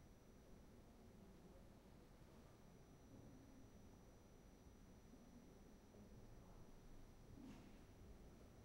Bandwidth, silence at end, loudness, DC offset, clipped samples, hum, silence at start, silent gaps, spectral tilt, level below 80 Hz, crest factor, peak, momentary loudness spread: 16 kHz; 0 s; -66 LUFS; under 0.1%; under 0.1%; none; 0 s; none; -6 dB/octave; -68 dBFS; 14 dB; -50 dBFS; 4 LU